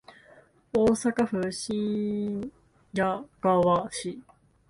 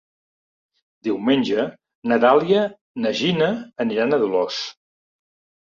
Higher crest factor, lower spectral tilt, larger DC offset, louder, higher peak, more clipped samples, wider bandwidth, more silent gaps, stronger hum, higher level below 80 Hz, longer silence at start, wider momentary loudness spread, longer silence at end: about the same, 18 dB vs 20 dB; about the same, -5.5 dB/octave vs -5.5 dB/octave; neither; second, -27 LUFS vs -20 LUFS; second, -10 dBFS vs -2 dBFS; neither; first, 11.5 kHz vs 7.6 kHz; second, none vs 1.95-2.02 s, 2.81-2.94 s; neither; first, -58 dBFS vs -64 dBFS; second, 0.75 s vs 1.05 s; about the same, 12 LU vs 13 LU; second, 0.5 s vs 0.9 s